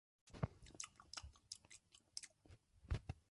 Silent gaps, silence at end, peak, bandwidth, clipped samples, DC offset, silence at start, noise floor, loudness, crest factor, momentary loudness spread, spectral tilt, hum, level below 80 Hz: none; 0.1 s; -28 dBFS; 11.5 kHz; under 0.1%; under 0.1%; 0.25 s; -69 dBFS; -53 LUFS; 26 dB; 15 LU; -4 dB/octave; none; -58 dBFS